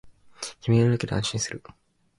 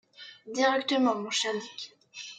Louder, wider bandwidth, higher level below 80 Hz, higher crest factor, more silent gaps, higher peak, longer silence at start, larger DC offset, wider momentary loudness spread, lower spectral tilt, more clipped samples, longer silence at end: first, -25 LUFS vs -28 LUFS; first, 11.5 kHz vs 9.2 kHz; first, -52 dBFS vs -86 dBFS; about the same, 16 dB vs 20 dB; neither; about the same, -10 dBFS vs -12 dBFS; second, 0.05 s vs 0.2 s; neither; about the same, 16 LU vs 18 LU; first, -5.5 dB/octave vs -2 dB/octave; neither; first, 0.6 s vs 0 s